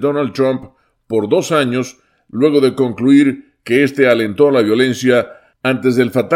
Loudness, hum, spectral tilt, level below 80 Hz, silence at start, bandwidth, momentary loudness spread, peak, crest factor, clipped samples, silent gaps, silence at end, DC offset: -14 LUFS; none; -6 dB/octave; -60 dBFS; 0 s; 15.5 kHz; 10 LU; 0 dBFS; 14 dB; under 0.1%; none; 0 s; under 0.1%